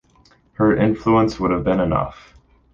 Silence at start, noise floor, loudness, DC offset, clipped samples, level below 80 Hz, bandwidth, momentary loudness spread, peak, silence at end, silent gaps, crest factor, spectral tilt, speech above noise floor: 0.6 s; -55 dBFS; -18 LUFS; under 0.1%; under 0.1%; -40 dBFS; 7.4 kHz; 5 LU; -4 dBFS; 0.6 s; none; 16 dB; -8 dB/octave; 37 dB